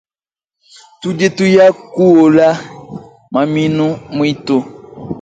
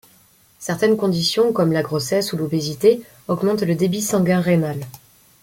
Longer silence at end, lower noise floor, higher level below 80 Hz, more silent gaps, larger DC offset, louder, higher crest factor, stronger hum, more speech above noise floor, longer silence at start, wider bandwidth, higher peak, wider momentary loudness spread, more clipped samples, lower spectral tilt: second, 0 s vs 0.45 s; first, under -90 dBFS vs -54 dBFS; about the same, -52 dBFS vs -56 dBFS; neither; neither; first, -12 LUFS vs -19 LUFS; about the same, 14 dB vs 18 dB; neither; first, over 79 dB vs 35 dB; first, 1 s vs 0.6 s; second, 9 kHz vs 17 kHz; about the same, 0 dBFS vs -2 dBFS; first, 23 LU vs 9 LU; neither; about the same, -6.5 dB/octave vs -5.5 dB/octave